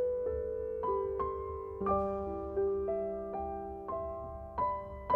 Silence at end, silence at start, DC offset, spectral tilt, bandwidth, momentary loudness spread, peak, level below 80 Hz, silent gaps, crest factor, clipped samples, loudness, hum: 0 s; 0 s; under 0.1%; -10 dB/octave; 4.4 kHz; 8 LU; -16 dBFS; -50 dBFS; none; 18 dB; under 0.1%; -36 LUFS; none